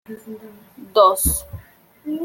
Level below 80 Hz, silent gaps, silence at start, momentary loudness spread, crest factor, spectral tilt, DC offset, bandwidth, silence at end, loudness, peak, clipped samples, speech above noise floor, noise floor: -36 dBFS; none; 0.1 s; 24 LU; 20 dB; -4 dB/octave; under 0.1%; 17 kHz; 0 s; -18 LUFS; -2 dBFS; under 0.1%; 27 dB; -47 dBFS